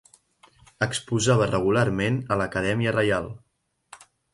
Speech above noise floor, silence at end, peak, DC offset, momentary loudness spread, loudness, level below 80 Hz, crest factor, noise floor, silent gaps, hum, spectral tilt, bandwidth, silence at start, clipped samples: 44 dB; 0.4 s; -8 dBFS; under 0.1%; 7 LU; -24 LUFS; -50 dBFS; 18 dB; -67 dBFS; none; none; -5.5 dB/octave; 11.5 kHz; 0.8 s; under 0.1%